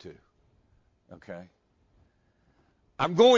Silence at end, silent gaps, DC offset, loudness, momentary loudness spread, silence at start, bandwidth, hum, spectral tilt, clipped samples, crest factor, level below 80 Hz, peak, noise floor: 0 s; none; under 0.1%; -28 LUFS; 26 LU; 0.05 s; 7.6 kHz; none; -5 dB/octave; under 0.1%; 22 dB; -64 dBFS; -8 dBFS; -68 dBFS